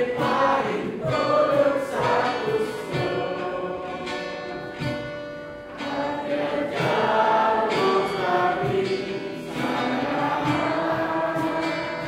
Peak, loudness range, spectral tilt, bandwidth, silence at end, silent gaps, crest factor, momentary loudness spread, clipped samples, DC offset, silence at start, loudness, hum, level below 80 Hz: -8 dBFS; 7 LU; -6 dB/octave; 16 kHz; 0 s; none; 16 dB; 11 LU; under 0.1%; under 0.1%; 0 s; -24 LUFS; none; -56 dBFS